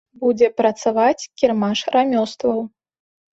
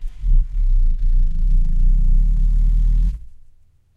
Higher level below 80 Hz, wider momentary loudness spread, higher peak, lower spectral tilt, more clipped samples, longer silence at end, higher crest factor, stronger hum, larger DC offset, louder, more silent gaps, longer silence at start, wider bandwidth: second, -62 dBFS vs -14 dBFS; about the same, 5 LU vs 3 LU; first, -2 dBFS vs -6 dBFS; second, -5 dB/octave vs -8.5 dB/octave; neither; about the same, 0.65 s vs 0.75 s; first, 16 dB vs 10 dB; neither; neither; first, -19 LUFS vs -22 LUFS; neither; first, 0.2 s vs 0 s; first, 8 kHz vs 0.4 kHz